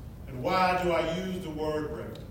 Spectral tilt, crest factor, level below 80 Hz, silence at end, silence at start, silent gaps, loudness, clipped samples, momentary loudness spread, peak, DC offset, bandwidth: -6 dB/octave; 16 dB; -48 dBFS; 0 s; 0 s; none; -29 LUFS; under 0.1%; 12 LU; -14 dBFS; under 0.1%; 16 kHz